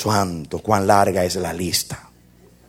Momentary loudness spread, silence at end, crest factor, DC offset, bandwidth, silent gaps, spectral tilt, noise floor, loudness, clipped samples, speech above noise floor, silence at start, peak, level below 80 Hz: 12 LU; 0.65 s; 20 dB; under 0.1%; 17 kHz; none; -4.5 dB/octave; -51 dBFS; -20 LUFS; under 0.1%; 31 dB; 0 s; 0 dBFS; -48 dBFS